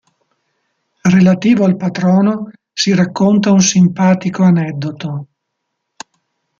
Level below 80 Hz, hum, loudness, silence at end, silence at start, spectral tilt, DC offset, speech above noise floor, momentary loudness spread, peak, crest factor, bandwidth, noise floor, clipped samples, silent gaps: -54 dBFS; none; -13 LUFS; 1.35 s; 1.05 s; -5.5 dB/octave; under 0.1%; 62 dB; 13 LU; 0 dBFS; 14 dB; 7.4 kHz; -73 dBFS; under 0.1%; none